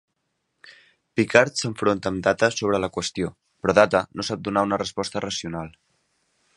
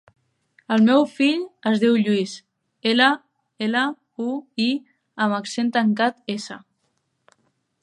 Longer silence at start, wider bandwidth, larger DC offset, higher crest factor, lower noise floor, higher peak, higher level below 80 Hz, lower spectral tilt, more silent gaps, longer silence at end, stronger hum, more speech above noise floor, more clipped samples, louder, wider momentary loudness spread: about the same, 0.65 s vs 0.7 s; about the same, 11.5 kHz vs 10.5 kHz; neither; about the same, 24 dB vs 20 dB; first, -76 dBFS vs -71 dBFS; about the same, 0 dBFS vs -2 dBFS; first, -54 dBFS vs -76 dBFS; about the same, -4.5 dB/octave vs -5 dB/octave; neither; second, 0.85 s vs 1.25 s; neither; about the same, 53 dB vs 51 dB; neither; about the same, -23 LUFS vs -21 LUFS; about the same, 12 LU vs 13 LU